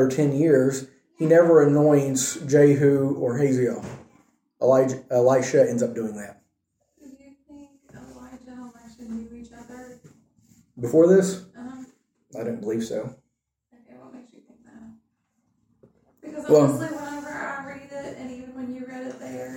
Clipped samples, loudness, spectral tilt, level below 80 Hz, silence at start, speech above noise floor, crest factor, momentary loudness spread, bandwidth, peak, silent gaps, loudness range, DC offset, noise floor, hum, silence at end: under 0.1%; -21 LUFS; -6.5 dB/octave; -64 dBFS; 0 s; 57 dB; 18 dB; 24 LU; 16.5 kHz; -4 dBFS; none; 23 LU; under 0.1%; -77 dBFS; none; 0 s